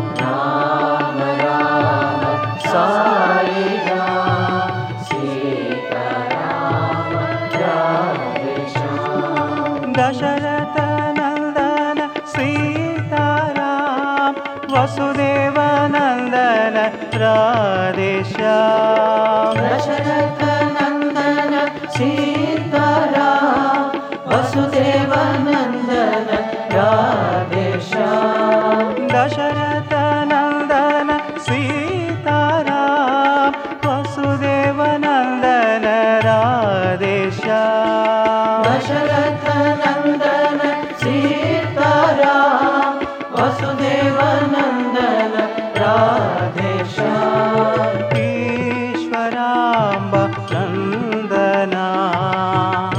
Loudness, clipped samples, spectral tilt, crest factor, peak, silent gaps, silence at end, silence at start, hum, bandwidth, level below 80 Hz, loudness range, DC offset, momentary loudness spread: -17 LUFS; under 0.1%; -6.5 dB/octave; 14 dB; -2 dBFS; none; 0 s; 0 s; none; 9.6 kHz; -54 dBFS; 3 LU; under 0.1%; 6 LU